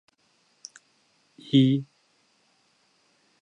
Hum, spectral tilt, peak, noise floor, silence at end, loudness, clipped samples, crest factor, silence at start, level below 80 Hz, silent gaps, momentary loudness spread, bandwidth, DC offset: none; -7 dB/octave; -8 dBFS; -67 dBFS; 1.6 s; -23 LUFS; under 0.1%; 22 dB; 1.55 s; -76 dBFS; none; 26 LU; 8.8 kHz; under 0.1%